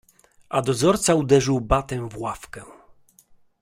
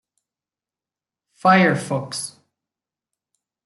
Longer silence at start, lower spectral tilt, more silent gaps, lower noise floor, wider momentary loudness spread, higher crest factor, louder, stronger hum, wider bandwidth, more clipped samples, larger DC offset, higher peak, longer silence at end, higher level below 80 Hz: second, 0.5 s vs 1.45 s; about the same, -5 dB/octave vs -5 dB/octave; neither; second, -56 dBFS vs under -90 dBFS; first, 17 LU vs 14 LU; about the same, 20 dB vs 22 dB; second, -22 LUFS vs -19 LUFS; neither; first, 16 kHz vs 12 kHz; neither; neither; about the same, -4 dBFS vs -2 dBFS; second, 0.9 s vs 1.35 s; first, -42 dBFS vs -68 dBFS